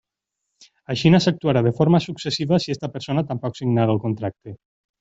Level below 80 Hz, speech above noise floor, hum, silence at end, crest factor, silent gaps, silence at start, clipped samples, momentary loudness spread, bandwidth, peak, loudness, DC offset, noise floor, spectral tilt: -56 dBFS; 61 dB; none; 0.45 s; 18 dB; none; 0.9 s; under 0.1%; 12 LU; 7.8 kHz; -2 dBFS; -21 LUFS; under 0.1%; -81 dBFS; -7 dB/octave